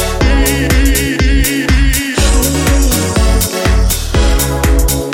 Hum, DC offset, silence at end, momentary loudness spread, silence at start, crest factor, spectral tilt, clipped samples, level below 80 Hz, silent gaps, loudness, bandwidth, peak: none; under 0.1%; 0 s; 2 LU; 0 s; 10 dB; -4 dB/octave; under 0.1%; -12 dBFS; none; -12 LUFS; 17 kHz; 0 dBFS